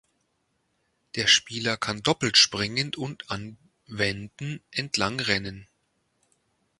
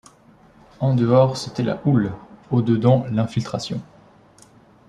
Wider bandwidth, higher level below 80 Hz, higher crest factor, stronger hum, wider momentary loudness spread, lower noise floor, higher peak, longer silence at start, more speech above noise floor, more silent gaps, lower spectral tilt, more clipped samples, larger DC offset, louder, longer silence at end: about the same, 11.5 kHz vs 10.5 kHz; about the same, -58 dBFS vs -54 dBFS; first, 24 dB vs 18 dB; neither; first, 17 LU vs 11 LU; first, -74 dBFS vs -51 dBFS; about the same, -4 dBFS vs -4 dBFS; first, 1.15 s vs 0.8 s; first, 47 dB vs 32 dB; neither; second, -2.5 dB/octave vs -7.5 dB/octave; neither; neither; second, -24 LUFS vs -20 LUFS; about the same, 1.15 s vs 1.05 s